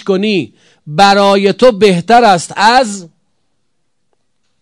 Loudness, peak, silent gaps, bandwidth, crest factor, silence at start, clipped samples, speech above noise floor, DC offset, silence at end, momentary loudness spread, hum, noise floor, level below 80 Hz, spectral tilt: -9 LUFS; 0 dBFS; none; 12 kHz; 12 dB; 0.05 s; 2%; 59 dB; under 0.1%; 1.55 s; 11 LU; none; -69 dBFS; -46 dBFS; -4.5 dB/octave